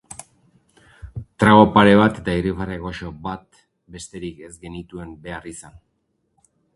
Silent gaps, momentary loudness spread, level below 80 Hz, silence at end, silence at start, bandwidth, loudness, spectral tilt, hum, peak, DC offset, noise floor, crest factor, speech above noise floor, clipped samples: none; 25 LU; -44 dBFS; 1.15 s; 1.05 s; 11.5 kHz; -16 LUFS; -6.5 dB/octave; none; 0 dBFS; under 0.1%; -70 dBFS; 20 dB; 51 dB; under 0.1%